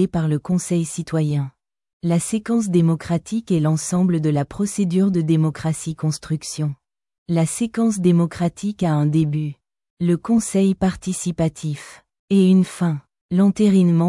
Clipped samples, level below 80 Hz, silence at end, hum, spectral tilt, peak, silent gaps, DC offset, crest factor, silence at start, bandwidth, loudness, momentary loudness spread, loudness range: under 0.1%; -52 dBFS; 0 s; none; -7 dB/octave; -6 dBFS; 1.93-2.00 s, 7.18-7.26 s, 9.90-9.97 s, 12.19-12.28 s, 13.21-13.29 s; under 0.1%; 14 dB; 0 s; 12 kHz; -20 LUFS; 9 LU; 2 LU